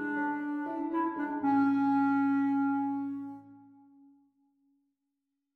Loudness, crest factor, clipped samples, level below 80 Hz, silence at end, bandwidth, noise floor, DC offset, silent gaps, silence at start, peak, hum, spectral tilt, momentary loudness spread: -30 LUFS; 12 dB; under 0.1%; -80 dBFS; 1.95 s; 4.4 kHz; -84 dBFS; under 0.1%; none; 0 s; -18 dBFS; none; -8 dB/octave; 11 LU